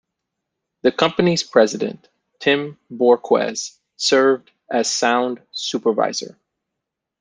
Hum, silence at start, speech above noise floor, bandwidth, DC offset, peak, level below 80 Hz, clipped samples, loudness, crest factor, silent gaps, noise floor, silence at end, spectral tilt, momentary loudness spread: none; 0.85 s; 63 dB; 10 kHz; under 0.1%; -2 dBFS; -64 dBFS; under 0.1%; -19 LUFS; 18 dB; none; -82 dBFS; 0.9 s; -3.5 dB/octave; 11 LU